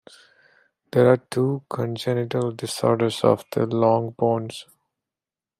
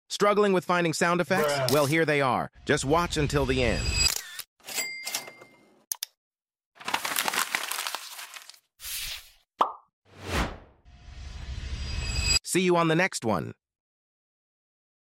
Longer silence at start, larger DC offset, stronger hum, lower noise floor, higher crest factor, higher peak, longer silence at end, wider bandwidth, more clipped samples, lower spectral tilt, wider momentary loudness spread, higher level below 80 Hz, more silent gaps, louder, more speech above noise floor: first, 0.95 s vs 0.1 s; neither; neither; first, under -90 dBFS vs -55 dBFS; about the same, 20 dB vs 22 dB; about the same, -4 dBFS vs -6 dBFS; second, 0.95 s vs 1.65 s; about the same, 15.5 kHz vs 16.5 kHz; neither; first, -6.5 dB/octave vs -3.5 dB/octave; second, 9 LU vs 17 LU; second, -68 dBFS vs -42 dBFS; second, none vs 4.47-4.56 s, 6.17-6.31 s, 6.66-6.72 s, 9.93-10.02 s; first, -22 LUFS vs -26 LUFS; first, over 68 dB vs 30 dB